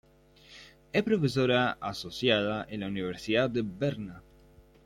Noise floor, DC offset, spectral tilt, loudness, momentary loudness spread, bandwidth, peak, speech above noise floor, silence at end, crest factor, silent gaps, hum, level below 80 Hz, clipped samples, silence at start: -58 dBFS; under 0.1%; -6 dB/octave; -29 LUFS; 16 LU; 16 kHz; -10 dBFS; 29 dB; 0.65 s; 20 dB; none; none; -60 dBFS; under 0.1%; 0.5 s